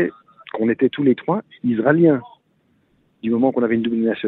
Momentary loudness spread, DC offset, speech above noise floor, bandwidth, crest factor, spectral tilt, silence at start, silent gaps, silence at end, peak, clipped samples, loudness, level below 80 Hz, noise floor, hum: 9 LU; under 0.1%; 45 dB; 4.1 kHz; 18 dB; -10.5 dB/octave; 0 s; none; 0 s; -2 dBFS; under 0.1%; -19 LUFS; -62 dBFS; -62 dBFS; none